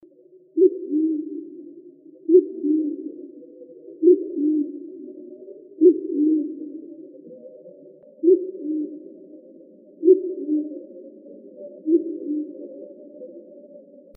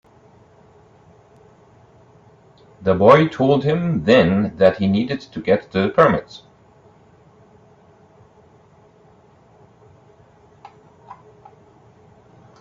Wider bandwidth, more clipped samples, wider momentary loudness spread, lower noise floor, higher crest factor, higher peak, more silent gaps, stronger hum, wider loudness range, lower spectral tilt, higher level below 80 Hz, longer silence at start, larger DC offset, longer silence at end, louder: second, 0.7 kHz vs 7.6 kHz; neither; first, 25 LU vs 13 LU; about the same, -52 dBFS vs -51 dBFS; about the same, 20 dB vs 22 dB; second, -4 dBFS vs 0 dBFS; neither; neither; about the same, 5 LU vs 7 LU; about the same, -8.5 dB/octave vs -8 dB/octave; second, under -90 dBFS vs -54 dBFS; second, 0.55 s vs 2.8 s; neither; second, 0.4 s vs 1.45 s; second, -21 LUFS vs -17 LUFS